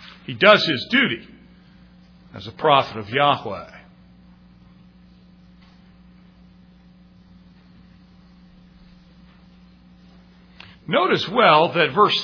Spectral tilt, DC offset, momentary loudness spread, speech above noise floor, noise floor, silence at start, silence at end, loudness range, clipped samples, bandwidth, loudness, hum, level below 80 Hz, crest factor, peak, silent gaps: -5.5 dB/octave; under 0.1%; 23 LU; 31 dB; -50 dBFS; 0 s; 0 s; 9 LU; under 0.1%; 5.4 kHz; -18 LUFS; none; -58 dBFS; 22 dB; 0 dBFS; none